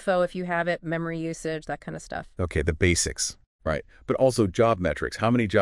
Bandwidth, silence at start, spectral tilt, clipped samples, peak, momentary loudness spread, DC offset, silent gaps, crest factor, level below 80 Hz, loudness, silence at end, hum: 12 kHz; 0 s; -5 dB/octave; under 0.1%; -6 dBFS; 12 LU; under 0.1%; 3.46-3.59 s; 20 dB; -44 dBFS; -26 LUFS; 0 s; none